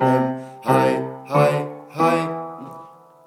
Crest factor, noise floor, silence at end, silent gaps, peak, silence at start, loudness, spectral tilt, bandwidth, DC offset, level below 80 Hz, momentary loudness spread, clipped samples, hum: 18 dB; -44 dBFS; 0.35 s; none; -4 dBFS; 0 s; -21 LUFS; -7 dB/octave; 17 kHz; under 0.1%; -70 dBFS; 17 LU; under 0.1%; none